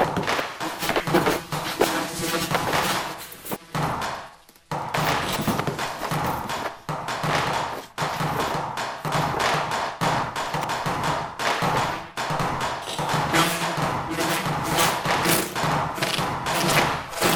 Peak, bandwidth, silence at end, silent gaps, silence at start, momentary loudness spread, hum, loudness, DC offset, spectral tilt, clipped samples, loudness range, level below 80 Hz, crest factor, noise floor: -4 dBFS; over 20 kHz; 0 s; none; 0 s; 8 LU; none; -24 LUFS; under 0.1%; -3.5 dB/octave; under 0.1%; 4 LU; -48 dBFS; 20 dB; -46 dBFS